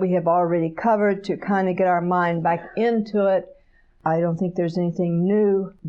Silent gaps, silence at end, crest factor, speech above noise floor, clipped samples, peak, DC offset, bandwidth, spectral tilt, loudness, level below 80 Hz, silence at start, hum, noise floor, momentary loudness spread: none; 0 s; 12 dB; 27 dB; under 0.1%; -10 dBFS; under 0.1%; 7 kHz; -9 dB/octave; -21 LUFS; -58 dBFS; 0 s; none; -48 dBFS; 4 LU